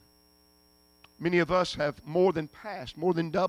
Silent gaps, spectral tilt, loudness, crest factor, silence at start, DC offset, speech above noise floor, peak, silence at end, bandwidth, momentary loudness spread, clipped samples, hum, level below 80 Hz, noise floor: none; -6.5 dB/octave; -29 LUFS; 16 dB; 1.2 s; under 0.1%; 35 dB; -14 dBFS; 0 s; 14.5 kHz; 13 LU; under 0.1%; 60 Hz at -55 dBFS; -58 dBFS; -63 dBFS